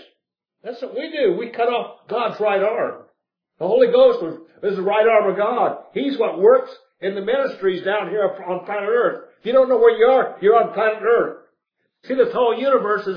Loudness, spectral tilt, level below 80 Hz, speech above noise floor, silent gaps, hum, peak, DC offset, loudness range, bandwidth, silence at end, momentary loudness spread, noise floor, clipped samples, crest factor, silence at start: -19 LUFS; -7.5 dB/octave; -68 dBFS; 57 dB; none; none; -2 dBFS; under 0.1%; 4 LU; 5.2 kHz; 0 s; 13 LU; -75 dBFS; under 0.1%; 16 dB; 0.65 s